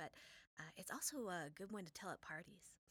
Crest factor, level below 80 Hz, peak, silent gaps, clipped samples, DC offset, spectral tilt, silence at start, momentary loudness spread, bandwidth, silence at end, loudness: 20 dB; -82 dBFS; -32 dBFS; 0.47-0.57 s; under 0.1%; under 0.1%; -3 dB/octave; 0 s; 16 LU; over 20 kHz; 0.15 s; -50 LUFS